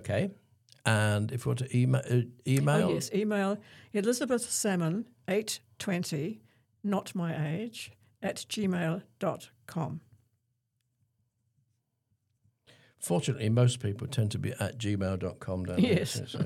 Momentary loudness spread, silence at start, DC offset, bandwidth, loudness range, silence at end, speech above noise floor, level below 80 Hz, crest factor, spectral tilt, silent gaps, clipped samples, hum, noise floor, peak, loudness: 10 LU; 0 s; under 0.1%; 15.5 kHz; 10 LU; 0 s; 49 dB; -66 dBFS; 24 dB; -5.5 dB/octave; none; under 0.1%; none; -79 dBFS; -8 dBFS; -31 LUFS